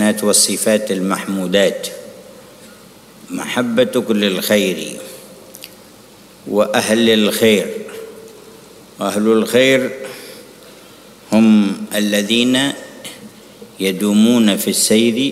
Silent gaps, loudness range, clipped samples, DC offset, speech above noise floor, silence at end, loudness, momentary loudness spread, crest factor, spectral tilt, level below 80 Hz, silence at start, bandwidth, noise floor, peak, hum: none; 3 LU; under 0.1%; under 0.1%; 27 dB; 0 s; -15 LUFS; 21 LU; 16 dB; -3.5 dB/octave; -60 dBFS; 0 s; 16 kHz; -42 dBFS; -2 dBFS; none